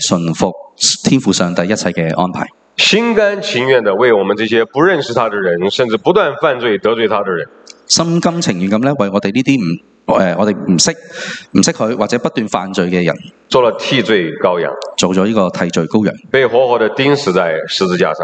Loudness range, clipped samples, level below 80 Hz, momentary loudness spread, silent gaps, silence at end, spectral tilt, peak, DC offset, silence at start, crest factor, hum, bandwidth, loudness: 2 LU; under 0.1%; -52 dBFS; 6 LU; none; 0 s; -4 dB/octave; 0 dBFS; under 0.1%; 0 s; 14 dB; none; 9.2 kHz; -13 LUFS